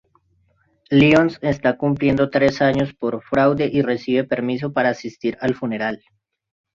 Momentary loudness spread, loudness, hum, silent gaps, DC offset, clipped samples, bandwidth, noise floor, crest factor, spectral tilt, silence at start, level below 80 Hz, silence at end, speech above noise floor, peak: 10 LU; -19 LUFS; none; none; under 0.1%; under 0.1%; 7.4 kHz; -62 dBFS; 18 dB; -7 dB/octave; 0.9 s; -50 dBFS; 0.8 s; 44 dB; -2 dBFS